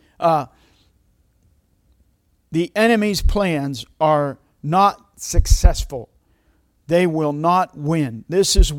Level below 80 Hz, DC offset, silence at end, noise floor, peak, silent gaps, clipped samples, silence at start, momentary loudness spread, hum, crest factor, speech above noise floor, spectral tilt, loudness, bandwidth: -24 dBFS; under 0.1%; 0 s; -62 dBFS; 0 dBFS; none; under 0.1%; 0.2 s; 11 LU; none; 20 dB; 45 dB; -5 dB/octave; -19 LUFS; 16.5 kHz